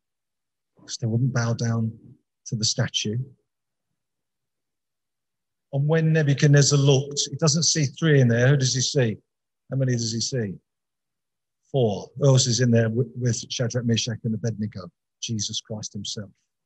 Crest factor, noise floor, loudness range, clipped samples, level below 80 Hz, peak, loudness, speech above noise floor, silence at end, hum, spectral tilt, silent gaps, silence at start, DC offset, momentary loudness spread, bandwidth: 18 dB; -89 dBFS; 10 LU; under 0.1%; -60 dBFS; -6 dBFS; -23 LUFS; 66 dB; 0.4 s; none; -4.5 dB/octave; none; 0.9 s; under 0.1%; 14 LU; 8.8 kHz